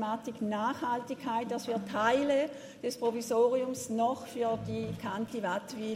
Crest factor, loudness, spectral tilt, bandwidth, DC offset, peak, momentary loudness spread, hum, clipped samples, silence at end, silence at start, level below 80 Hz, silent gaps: 18 dB; -32 LUFS; -5 dB/octave; 16 kHz; under 0.1%; -14 dBFS; 8 LU; none; under 0.1%; 0 s; 0 s; -68 dBFS; none